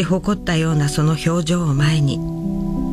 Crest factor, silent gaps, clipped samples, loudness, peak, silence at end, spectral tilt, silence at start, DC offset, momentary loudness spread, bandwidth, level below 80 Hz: 12 dB; none; under 0.1%; -19 LUFS; -6 dBFS; 0 s; -6 dB/octave; 0 s; under 0.1%; 6 LU; 14 kHz; -34 dBFS